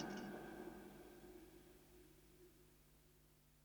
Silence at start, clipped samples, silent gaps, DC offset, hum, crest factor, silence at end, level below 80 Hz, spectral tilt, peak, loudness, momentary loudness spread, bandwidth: 0 s; under 0.1%; none; under 0.1%; none; 24 dB; 0 s; -74 dBFS; -5 dB/octave; -34 dBFS; -58 LUFS; 15 LU; over 20 kHz